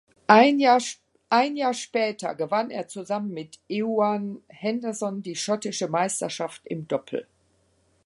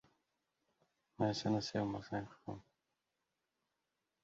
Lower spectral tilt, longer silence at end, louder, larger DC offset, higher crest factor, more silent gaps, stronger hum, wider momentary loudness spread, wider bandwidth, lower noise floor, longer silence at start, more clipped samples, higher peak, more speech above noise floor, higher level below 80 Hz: second, -4 dB/octave vs -5.5 dB/octave; second, 0.85 s vs 1.65 s; first, -25 LUFS vs -40 LUFS; neither; about the same, 24 dB vs 22 dB; neither; neither; about the same, 16 LU vs 14 LU; first, 11.5 kHz vs 7.6 kHz; second, -66 dBFS vs -88 dBFS; second, 0.3 s vs 1.2 s; neither; first, 0 dBFS vs -22 dBFS; second, 42 dB vs 49 dB; about the same, -74 dBFS vs -72 dBFS